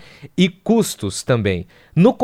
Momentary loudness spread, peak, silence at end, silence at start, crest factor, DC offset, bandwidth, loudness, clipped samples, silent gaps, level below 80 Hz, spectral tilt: 9 LU; 0 dBFS; 0 s; 0.2 s; 18 dB; under 0.1%; 15.5 kHz; -19 LUFS; under 0.1%; none; -50 dBFS; -6 dB/octave